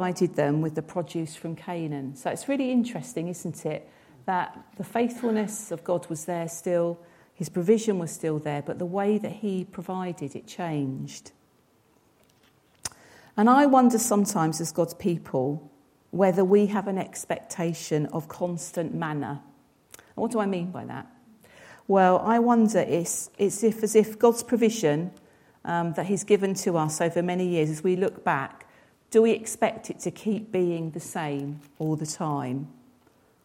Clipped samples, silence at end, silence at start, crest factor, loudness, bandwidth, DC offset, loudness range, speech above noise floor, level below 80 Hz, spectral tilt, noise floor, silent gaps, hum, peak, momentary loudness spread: under 0.1%; 0.75 s; 0 s; 20 dB; -26 LUFS; 16.5 kHz; under 0.1%; 8 LU; 38 dB; -70 dBFS; -5.5 dB/octave; -63 dBFS; none; none; -6 dBFS; 14 LU